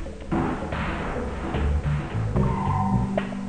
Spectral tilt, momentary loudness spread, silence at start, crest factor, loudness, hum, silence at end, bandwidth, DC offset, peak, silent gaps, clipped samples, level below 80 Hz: -8 dB/octave; 5 LU; 0 s; 14 dB; -26 LUFS; none; 0 s; 9.6 kHz; 0.5%; -10 dBFS; none; under 0.1%; -32 dBFS